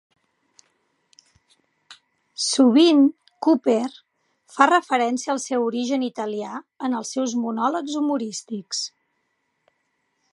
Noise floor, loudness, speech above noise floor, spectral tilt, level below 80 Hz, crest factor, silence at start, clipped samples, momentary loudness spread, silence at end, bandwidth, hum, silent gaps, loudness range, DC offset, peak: -73 dBFS; -21 LUFS; 52 dB; -3 dB/octave; -80 dBFS; 22 dB; 1.9 s; under 0.1%; 14 LU; 1.45 s; 11.5 kHz; none; none; 7 LU; under 0.1%; -2 dBFS